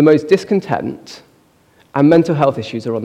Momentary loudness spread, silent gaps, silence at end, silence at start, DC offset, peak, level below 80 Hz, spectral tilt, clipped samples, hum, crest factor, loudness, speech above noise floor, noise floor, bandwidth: 13 LU; none; 0 s; 0 s; under 0.1%; 0 dBFS; -58 dBFS; -7.5 dB/octave; under 0.1%; none; 14 dB; -15 LUFS; 39 dB; -53 dBFS; 9.6 kHz